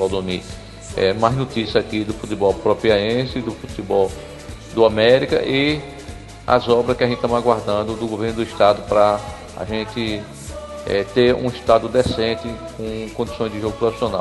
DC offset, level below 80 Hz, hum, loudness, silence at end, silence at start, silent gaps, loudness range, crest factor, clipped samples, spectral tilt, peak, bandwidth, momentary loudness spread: under 0.1%; -40 dBFS; none; -19 LUFS; 0 s; 0 s; none; 2 LU; 18 dB; under 0.1%; -5.5 dB/octave; 0 dBFS; 12 kHz; 14 LU